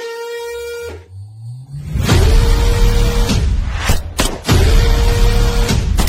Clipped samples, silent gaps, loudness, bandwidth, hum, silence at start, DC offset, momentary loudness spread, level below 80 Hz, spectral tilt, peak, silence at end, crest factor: under 0.1%; none; -16 LUFS; 16 kHz; none; 0 s; under 0.1%; 17 LU; -14 dBFS; -5 dB/octave; 0 dBFS; 0 s; 12 dB